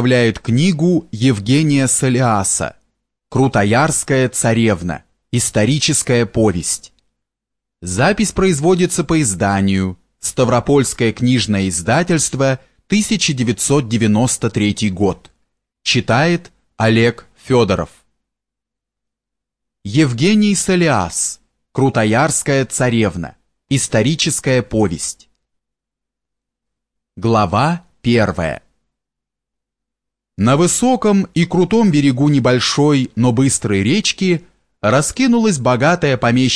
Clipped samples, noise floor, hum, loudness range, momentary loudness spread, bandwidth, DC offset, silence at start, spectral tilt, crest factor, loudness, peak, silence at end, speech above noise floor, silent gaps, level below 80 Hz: under 0.1%; -83 dBFS; none; 5 LU; 8 LU; 11 kHz; under 0.1%; 0 s; -4.5 dB/octave; 14 dB; -15 LUFS; -2 dBFS; 0 s; 69 dB; none; -42 dBFS